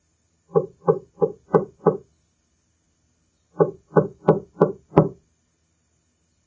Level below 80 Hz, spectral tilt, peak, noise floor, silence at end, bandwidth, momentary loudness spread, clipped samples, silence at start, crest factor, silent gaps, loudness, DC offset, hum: -56 dBFS; -10.5 dB/octave; 0 dBFS; -68 dBFS; 1.35 s; 7.2 kHz; 5 LU; under 0.1%; 0.55 s; 24 dB; none; -22 LUFS; under 0.1%; none